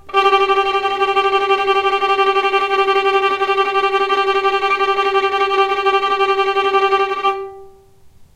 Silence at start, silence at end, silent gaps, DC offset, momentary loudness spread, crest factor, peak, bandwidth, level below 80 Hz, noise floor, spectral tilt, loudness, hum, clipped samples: 0.05 s; 0.1 s; none; under 0.1%; 2 LU; 14 dB; -2 dBFS; 11.5 kHz; -52 dBFS; -45 dBFS; -2.5 dB/octave; -15 LUFS; none; under 0.1%